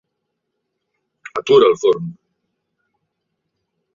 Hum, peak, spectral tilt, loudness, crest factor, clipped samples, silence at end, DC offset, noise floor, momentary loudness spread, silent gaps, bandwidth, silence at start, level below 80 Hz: none; -2 dBFS; -5.5 dB/octave; -14 LUFS; 20 dB; under 0.1%; 1.85 s; under 0.1%; -76 dBFS; 16 LU; none; 7.4 kHz; 1.35 s; -66 dBFS